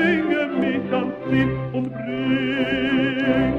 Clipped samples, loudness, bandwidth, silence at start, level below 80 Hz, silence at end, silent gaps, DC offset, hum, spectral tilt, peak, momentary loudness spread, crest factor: under 0.1%; -22 LUFS; 5.8 kHz; 0 s; -46 dBFS; 0 s; none; under 0.1%; none; -8 dB/octave; -6 dBFS; 6 LU; 14 dB